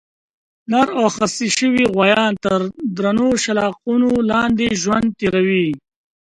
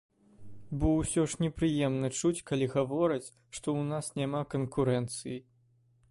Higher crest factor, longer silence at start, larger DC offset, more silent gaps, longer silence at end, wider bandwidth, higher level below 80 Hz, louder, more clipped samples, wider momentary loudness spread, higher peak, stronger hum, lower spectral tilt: about the same, 18 dB vs 16 dB; first, 0.7 s vs 0.4 s; neither; neither; second, 0.4 s vs 0.7 s; about the same, 11 kHz vs 11.5 kHz; about the same, -50 dBFS vs -50 dBFS; first, -17 LUFS vs -31 LUFS; neither; second, 6 LU vs 10 LU; first, 0 dBFS vs -16 dBFS; neither; second, -4.5 dB/octave vs -6 dB/octave